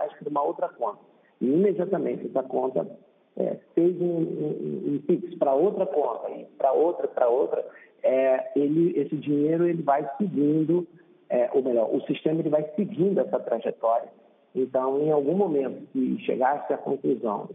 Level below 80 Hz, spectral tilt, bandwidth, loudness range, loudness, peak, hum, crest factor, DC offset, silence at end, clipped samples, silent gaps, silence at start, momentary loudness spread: -80 dBFS; -10.5 dB/octave; 3.8 kHz; 3 LU; -26 LUFS; -8 dBFS; none; 16 dB; under 0.1%; 0 s; under 0.1%; none; 0 s; 8 LU